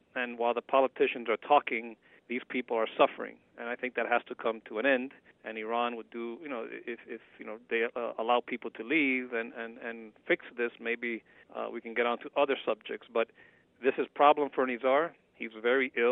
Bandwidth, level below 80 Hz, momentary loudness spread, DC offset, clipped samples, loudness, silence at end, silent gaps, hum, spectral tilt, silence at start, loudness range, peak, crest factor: 4 kHz; -82 dBFS; 15 LU; under 0.1%; under 0.1%; -31 LUFS; 0 s; none; none; -7 dB/octave; 0.15 s; 5 LU; -10 dBFS; 22 dB